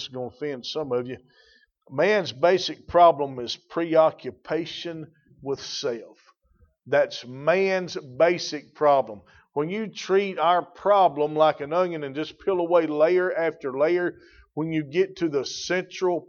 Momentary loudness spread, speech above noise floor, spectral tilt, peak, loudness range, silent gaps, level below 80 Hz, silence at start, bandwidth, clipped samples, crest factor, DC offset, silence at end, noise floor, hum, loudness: 13 LU; 38 dB; -5 dB/octave; -6 dBFS; 5 LU; none; -64 dBFS; 0 s; 7.2 kHz; under 0.1%; 20 dB; under 0.1%; 0.1 s; -62 dBFS; none; -24 LUFS